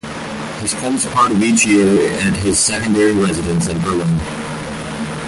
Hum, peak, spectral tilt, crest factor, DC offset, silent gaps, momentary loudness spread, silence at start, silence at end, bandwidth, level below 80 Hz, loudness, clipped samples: none; -2 dBFS; -4.5 dB/octave; 14 dB; under 0.1%; none; 13 LU; 0.05 s; 0 s; 11.5 kHz; -38 dBFS; -16 LUFS; under 0.1%